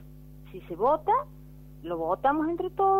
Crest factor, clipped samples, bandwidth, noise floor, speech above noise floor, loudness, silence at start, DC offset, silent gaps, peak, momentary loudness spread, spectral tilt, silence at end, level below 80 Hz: 16 dB; under 0.1%; 16 kHz; -47 dBFS; 21 dB; -27 LUFS; 0 s; under 0.1%; none; -12 dBFS; 18 LU; -8 dB/octave; 0 s; -52 dBFS